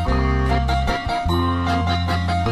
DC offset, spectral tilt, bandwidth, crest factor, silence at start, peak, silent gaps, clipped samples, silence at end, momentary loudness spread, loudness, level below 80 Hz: under 0.1%; -6.5 dB/octave; 13 kHz; 12 dB; 0 s; -6 dBFS; none; under 0.1%; 0 s; 2 LU; -21 LUFS; -26 dBFS